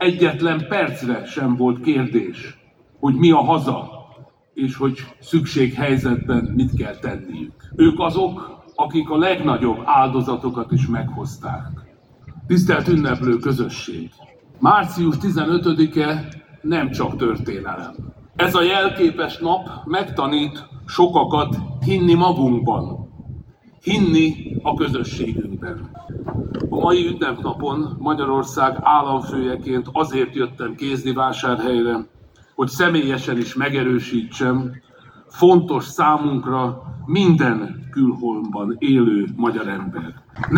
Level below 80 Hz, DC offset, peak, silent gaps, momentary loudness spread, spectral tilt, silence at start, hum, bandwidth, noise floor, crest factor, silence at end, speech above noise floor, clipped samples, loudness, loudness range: -46 dBFS; under 0.1%; 0 dBFS; none; 15 LU; -7 dB/octave; 0 s; none; 17 kHz; -47 dBFS; 18 dB; 0 s; 28 dB; under 0.1%; -19 LUFS; 3 LU